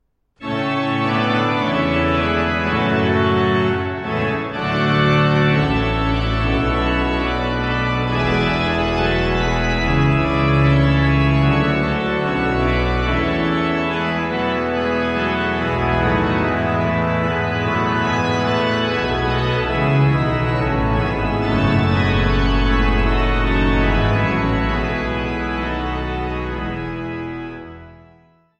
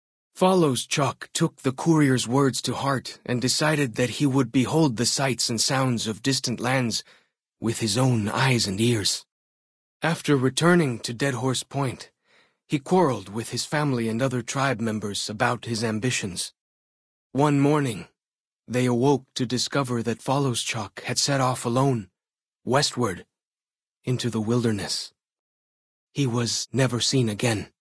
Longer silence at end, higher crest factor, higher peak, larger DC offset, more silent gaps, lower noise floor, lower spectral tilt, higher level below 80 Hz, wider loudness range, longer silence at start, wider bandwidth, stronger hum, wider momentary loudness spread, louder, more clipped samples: first, 0.65 s vs 0.15 s; about the same, 14 dB vs 18 dB; about the same, -4 dBFS vs -6 dBFS; neither; second, none vs 9.32-10.00 s, 16.61-17.30 s, 18.35-18.57 s, 23.47-23.51 s, 25.39-26.07 s; second, -52 dBFS vs under -90 dBFS; first, -7 dB/octave vs -4.5 dB/octave; first, -26 dBFS vs -60 dBFS; about the same, 3 LU vs 4 LU; about the same, 0.4 s vs 0.35 s; second, 8.4 kHz vs 11 kHz; neither; about the same, 7 LU vs 9 LU; first, -18 LUFS vs -24 LUFS; neither